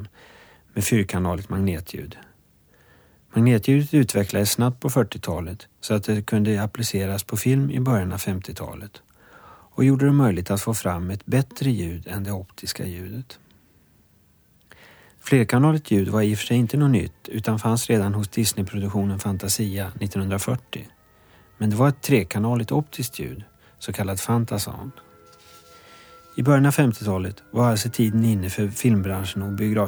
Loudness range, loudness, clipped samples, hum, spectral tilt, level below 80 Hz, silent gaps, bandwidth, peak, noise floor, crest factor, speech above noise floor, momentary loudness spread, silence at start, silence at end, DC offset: 6 LU; -22 LUFS; under 0.1%; none; -6 dB/octave; -50 dBFS; none; over 20 kHz; -4 dBFS; -59 dBFS; 18 dB; 37 dB; 15 LU; 0 s; 0 s; under 0.1%